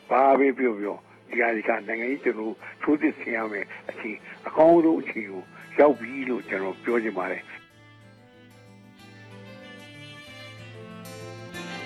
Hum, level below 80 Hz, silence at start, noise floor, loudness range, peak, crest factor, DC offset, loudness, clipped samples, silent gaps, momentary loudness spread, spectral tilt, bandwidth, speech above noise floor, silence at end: none; -72 dBFS; 0.1 s; -51 dBFS; 20 LU; -6 dBFS; 20 dB; under 0.1%; -25 LUFS; under 0.1%; none; 23 LU; -6.5 dB/octave; 13.5 kHz; 27 dB; 0 s